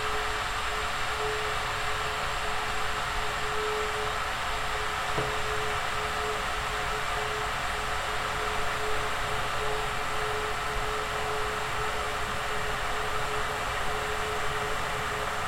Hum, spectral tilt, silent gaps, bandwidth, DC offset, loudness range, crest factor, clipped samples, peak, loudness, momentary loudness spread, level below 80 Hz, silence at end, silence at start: none; -2.5 dB/octave; none; 16.5 kHz; under 0.1%; 1 LU; 14 dB; under 0.1%; -16 dBFS; -30 LUFS; 1 LU; -42 dBFS; 0 s; 0 s